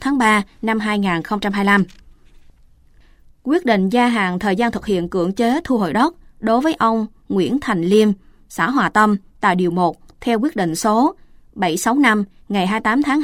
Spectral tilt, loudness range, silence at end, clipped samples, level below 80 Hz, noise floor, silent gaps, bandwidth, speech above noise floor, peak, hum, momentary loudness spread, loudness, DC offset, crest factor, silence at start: -5.5 dB/octave; 2 LU; 0 s; under 0.1%; -48 dBFS; -49 dBFS; none; 16 kHz; 32 dB; -2 dBFS; none; 7 LU; -18 LUFS; under 0.1%; 16 dB; 0 s